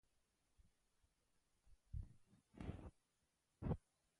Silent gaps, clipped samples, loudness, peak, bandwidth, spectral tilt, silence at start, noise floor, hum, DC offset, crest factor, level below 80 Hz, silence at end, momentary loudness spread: none; under 0.1%; -53 LUFS; -32 dBFS; 11 kHz; -9 dB/octave; 1.65 s; -87 dBFS; none; under 0.1%; 24 dB; -62 dBFS; 0.4 s; 13 LU